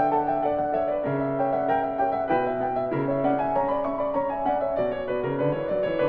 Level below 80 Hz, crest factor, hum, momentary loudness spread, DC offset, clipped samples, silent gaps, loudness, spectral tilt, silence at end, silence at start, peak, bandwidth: -52 dBFS; 14 dB; none; 2 LU; under 0.1%; under 0.1%; none; -25 LUFS; -10 dB/octave; 0 s; 0 s; -10 dBFS; 5 kHz